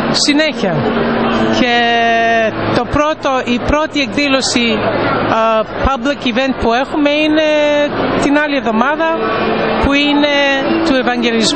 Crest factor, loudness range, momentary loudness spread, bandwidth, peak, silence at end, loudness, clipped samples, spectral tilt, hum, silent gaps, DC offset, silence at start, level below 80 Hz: 12 dB; 1 LU; 4 LU; 8.8 kHz; 0 dBFS; 0 s; -13 LUFS; under 0.1%; -4 dB/octave; none; none; 0.8%; 0 s; -32 dBFS